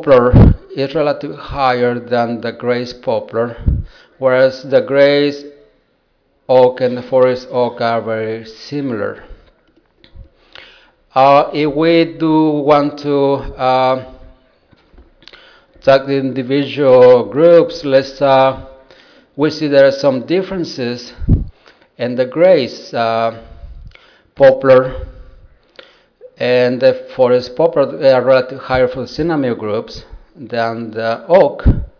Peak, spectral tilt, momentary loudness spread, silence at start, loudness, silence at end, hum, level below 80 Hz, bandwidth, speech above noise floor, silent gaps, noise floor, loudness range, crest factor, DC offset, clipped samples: 0 dBFS; -7.5 dB/octave; 12 LU; 0 s; -14 LUFS; 0.1 s; none; -28 dBFS; 5.4 kHz; 47 dB; none; -60 dBFS; 6 LU; 14 dB; under 0.1%; under 0.1%